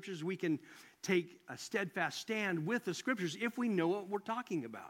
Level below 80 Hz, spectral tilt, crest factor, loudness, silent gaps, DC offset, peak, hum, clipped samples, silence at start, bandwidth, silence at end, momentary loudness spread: -86 dBFS; -5 dB/octave; 18 dB; -37 LUFS; none; under 0.1%; -18 dBFS; none; under 0.1%; 0 s; 16.5 kHz; 0 s; 6 LU